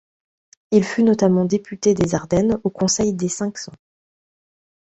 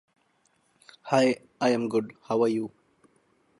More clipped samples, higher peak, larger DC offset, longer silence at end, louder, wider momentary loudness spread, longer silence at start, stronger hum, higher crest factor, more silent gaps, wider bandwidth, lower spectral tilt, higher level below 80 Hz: neither; first, -4 dBFS vs -8 dBFS; neither; first, 1.1 s vs 0.9 s; first, -19 LUFS vs -26 LUFS; about the same, 9 LU vs 10 LU; second, 0.7 s vs 1.05 s; neither; about the same, 18 dB vs 22 dB; neither; second, 8.2 kHz vs 11.5 kHz; about the same, -5.5 dB/octave vs -5.5 dB/octave; first, -48 dBFS vs -74 dBFS